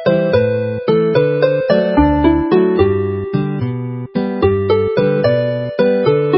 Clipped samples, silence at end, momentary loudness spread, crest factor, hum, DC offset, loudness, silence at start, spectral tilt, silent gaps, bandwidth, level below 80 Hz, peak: under 0.1%; 0 s; 7 LU; 14 dB; none; under 0.1%; -15 LUFS; 0 s; -12 dB/octave; none; 5.8 kHz; -32 dBFS; 0 dBFS